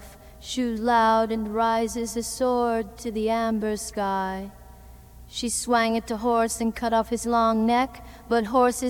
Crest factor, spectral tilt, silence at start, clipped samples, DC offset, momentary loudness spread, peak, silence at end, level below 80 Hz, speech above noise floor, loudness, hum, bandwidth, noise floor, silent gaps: 16 dB; -4 dB/octave; 0 s; under 0.1%; under 0.1%; 10 LU; -8 dBFS; 0 s; -48 dBFS; 22 dB; -24 LUFS; none; 19 kHz; -46 dBFS; none